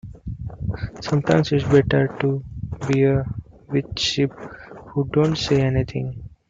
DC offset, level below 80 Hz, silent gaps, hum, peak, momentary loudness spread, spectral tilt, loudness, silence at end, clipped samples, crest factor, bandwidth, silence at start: under 0.1%; -42 dBFS; none; none; -4 dBFS; 16 LU; -6.5 dB/octave; -21 LUFS; 0.2 s; under 0.1%; 18 dB; 7.6 kHz; 0.05 s